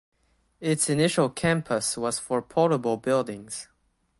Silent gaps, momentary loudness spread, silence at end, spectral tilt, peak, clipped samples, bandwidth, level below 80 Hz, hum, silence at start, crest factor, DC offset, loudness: none; 11 LU; 0.55 s; -4.5 dB/octave; -8 dBFS; under 0.1%; 12 kHz; -60 dBFS; none; 0.6 s; 18 dB; under 0.1%; -25 LUFS